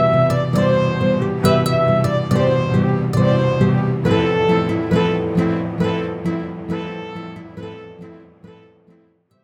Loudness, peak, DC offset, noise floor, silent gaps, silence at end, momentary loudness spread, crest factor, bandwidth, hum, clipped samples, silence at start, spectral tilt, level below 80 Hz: -18 LUFS; -2 dBFS; under 0.1%; -57 dBFS; none; 0.9 s; 15 LU; 16 dB; 15.5 kHz; none; under 0.1%; 0 s; -7.5 dB/octave; -46 dBFS